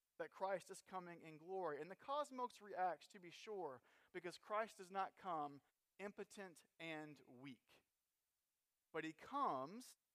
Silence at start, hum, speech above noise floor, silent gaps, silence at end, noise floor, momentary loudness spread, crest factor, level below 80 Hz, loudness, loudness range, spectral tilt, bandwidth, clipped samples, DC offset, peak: 0.2 s; none; over 40 dB; none; 0.2 s; under -90 dBFS; 14 LU; 20 dB; under -90 dBFS; -50 LUFS; 7 LU; -4.5 dB/octave; 15 kHz; under 0.1%; under 0.1%; -32 dBFS